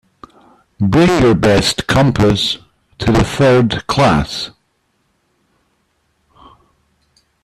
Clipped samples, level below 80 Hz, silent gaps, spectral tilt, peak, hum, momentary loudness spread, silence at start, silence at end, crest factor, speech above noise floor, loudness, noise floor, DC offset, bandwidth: under 0.1%; -34 dBFS; none; -5.5 dB/octave; -4 dBFS; none; 10 LU; 0.8 s; 2.95 s; 12 dB; 51 dB; -13 LUFS; -63 dBFS; under 0.1%; 14.5 kHz